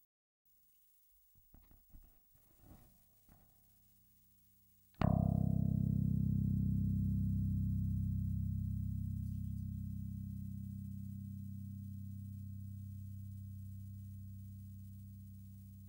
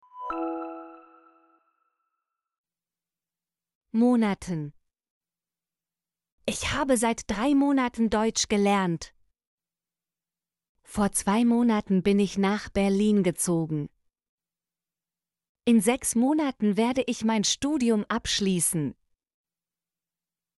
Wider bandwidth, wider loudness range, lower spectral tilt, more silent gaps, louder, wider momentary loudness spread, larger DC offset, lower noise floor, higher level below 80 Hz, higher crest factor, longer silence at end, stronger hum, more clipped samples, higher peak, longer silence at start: first, 16.5 kHz vs 11.5 kHz; first, 13 LU vs 6 LU; first, -10 dB/octave vs -4.5 dB/octave; second, none vs 2.58-2.64 s, 3.75-3.81 s, 5.10-5.21 s, 6.32-6.38 s, 9.47-9.58 s, 10.69-10.75 s, 14.29-14.38 s, 15.49-15.55 s; second, -40 LUFS vs -25 LUFS; first, 16 LU vs 12 LU; neither; second, -70 dBFS vs under -90 dBFS; about the same, -52 dBFS vs -54 dBFS; about the same, 22 dB vs 18 dB; second, 0 s vs 1.65 s; neither; neither; second, -20 dBFS vs -10 dBFS; first, 1.7 s vs 0.15 s